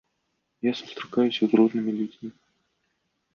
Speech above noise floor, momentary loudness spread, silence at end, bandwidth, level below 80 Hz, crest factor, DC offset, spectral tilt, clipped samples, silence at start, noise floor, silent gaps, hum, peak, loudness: 52 dB; 14 LU; 1.05 s; 6.8 kHz; -74 dBFS; 20 dB; under 0.1%; -6.5 dB/octave; under 0.1%; 0.65 s; -76 dBFS; none; none; -6 dBFS; -25 LUFS